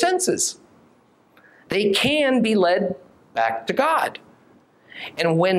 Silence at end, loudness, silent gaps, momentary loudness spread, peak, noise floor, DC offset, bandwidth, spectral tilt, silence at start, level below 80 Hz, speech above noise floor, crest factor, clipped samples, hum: 0 s; -21 LUFS; none; 18 LU; -6 dBFS; -57 dBFS; under 0.1%; 16 kHz; -3.5 dB/octave; 0 s; -62 dBFS; 37 dB; 18 dB; under 0.1%; none